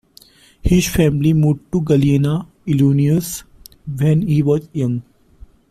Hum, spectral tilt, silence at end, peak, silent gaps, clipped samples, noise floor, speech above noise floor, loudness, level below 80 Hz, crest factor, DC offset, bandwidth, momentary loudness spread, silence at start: none; -7 dB/octave; 0.7 s; -2 dBFS; none; under 0.1%; -48 dBFS; 33 dB; -17 LUFS; -34 dBFS; 14 dB; under 0.1%; 15 kHz; 12 LU; 0.65 s